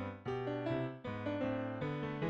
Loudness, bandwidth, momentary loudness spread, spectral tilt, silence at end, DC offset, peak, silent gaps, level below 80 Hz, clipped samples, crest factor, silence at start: -40 LUFS; 7.8 kHz; 4 LU; -8.5 dB/octave; 0 s; under 0.1%; -26 dBFS; none; -66 dBFS; under 0.1%; 14 dB; 0 s